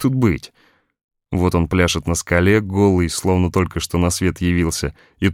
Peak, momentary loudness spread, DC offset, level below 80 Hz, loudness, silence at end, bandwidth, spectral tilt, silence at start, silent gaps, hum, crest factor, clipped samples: -2 dBFS; 6 LU; under 0.1%; -34 dBFS; -18 LUFS; 0 s; 16 kHz; -5.5 dB/octave; 0 s; 1.04-1.09 s; none; 16 dB; under 0.1%